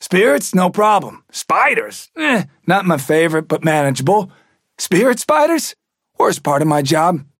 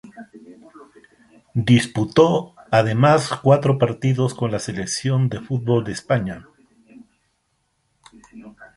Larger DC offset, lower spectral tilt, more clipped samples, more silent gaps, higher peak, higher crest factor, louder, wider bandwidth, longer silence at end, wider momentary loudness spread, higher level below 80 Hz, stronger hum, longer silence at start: neither; about the same, -5 dB/octave vs -6 dB/octave; neither; neither; about the same, -2 dBFS vs -2 dBFS; second, 12 dB vs 18 dB; first, -15 LUFS vs -19 LUFS; first, 17 kHz vs 11.5 kHz; about the same, 0.15 s vs 0.1 s; second, 6 LU vs 9 LU; second, -64 dBFS vs -54 dBFS; neither; about the same, 0 s vs 0.05 s